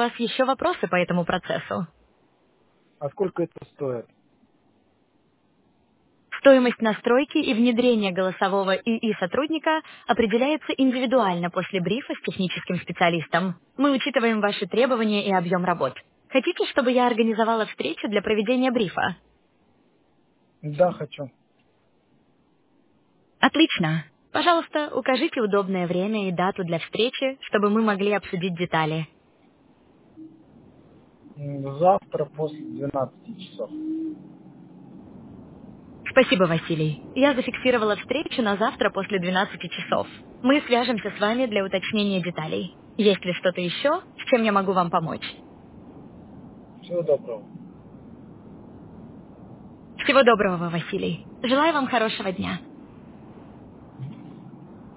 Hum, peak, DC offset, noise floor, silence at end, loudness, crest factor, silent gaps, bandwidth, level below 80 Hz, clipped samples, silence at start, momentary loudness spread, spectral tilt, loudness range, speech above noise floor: none; -4 dBFS; under 0.1%; -64 dBFS; 0 s; -23 LUFS; 22 dB; none; 4 kHz; -60 dBFS; under 0.1%; 0 s; 16 LU; -9.5 dB/octave; 10 LU; 41 dB